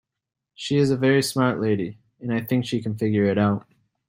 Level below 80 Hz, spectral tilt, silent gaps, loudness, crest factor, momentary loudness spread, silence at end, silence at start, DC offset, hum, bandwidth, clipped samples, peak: -60 dBFS; -6 dB/octave; none; -23 LUFS; 18 dB; 10 LU; 0.5 s; 0.6 s; under 0.1%; none; 16 kHz; under 0.1%; -6 dBFS